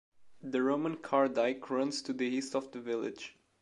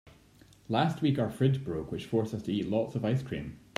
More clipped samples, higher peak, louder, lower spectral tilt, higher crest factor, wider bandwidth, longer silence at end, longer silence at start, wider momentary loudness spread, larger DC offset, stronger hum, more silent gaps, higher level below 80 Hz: neither; about the same, -14 dBFS vs -12 dBFS; about the same, -33 LUFS vs -31 LUFS; second, -4.5 dB/octave vs -7.5 dB/octave; about the same, 20 dB vs 20 dB; second, 11.5 kHz vs 13.5 kHz; about the same, 0.3 s vs 0.2 s; second, 0.2 s vs 0.7 s; about the same, 10 LU vs 8 LU; neither; neither; neither; second, -80 dBFS vs -58 dBFS